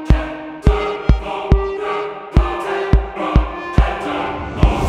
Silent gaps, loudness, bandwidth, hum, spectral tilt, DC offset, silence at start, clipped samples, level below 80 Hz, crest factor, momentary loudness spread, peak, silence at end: none; -19 LUFS; 8.4 kHz; none; -7.5 dB/octave; under 0.1%; 0 s; under 0.1%; -18 dBFS; 16 dB; 5 LU; 0 dBFS; 0 s